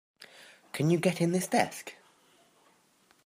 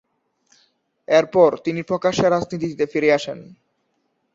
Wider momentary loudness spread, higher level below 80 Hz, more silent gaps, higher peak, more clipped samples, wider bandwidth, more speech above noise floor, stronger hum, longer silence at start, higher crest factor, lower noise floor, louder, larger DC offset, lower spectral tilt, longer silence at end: first, 22 LU vs 10 LU; second, -76 dBFS vs -58 dBFS; neither; second, -10 dBFS vs -2 dBFS; neither; first, 15.5 kHz vs 7.8 kHz; second, 38 dB vs 51 dB; neither; second, 0.2 s vs 1.1 s; about the same, 22 dB vs 18 dB; second, -66 dBFS vs -70 dBFS; second, -29 LUFS vs -19 LUFS; neither; about the same, -5.5 dB/octave vs -5.5 dB/octave; first, 1.35 s vs 0.9 s